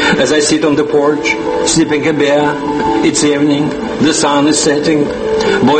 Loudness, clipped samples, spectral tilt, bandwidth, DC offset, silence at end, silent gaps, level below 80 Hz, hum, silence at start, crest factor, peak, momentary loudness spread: -12 LUFS; under 0.1%; -4 dB/octave; 8.8 kHz; under 0.1%; 0 s; none; -40 dBFS; none; 0 s; 12 dB; 0 dBFS; 4 LU